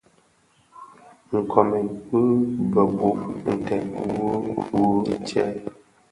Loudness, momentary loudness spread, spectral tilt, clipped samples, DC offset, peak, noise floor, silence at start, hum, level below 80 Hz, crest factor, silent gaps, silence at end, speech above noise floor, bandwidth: -23 LUFS; 7 LU; -8 dB/octave; under 0.1%; under 0.1%; 0 dBFS; -61 dBFS; 0.75 s; none; -54 dBFS; 22 dB; none; 0.4 s; 39 dB; 11.5 kHz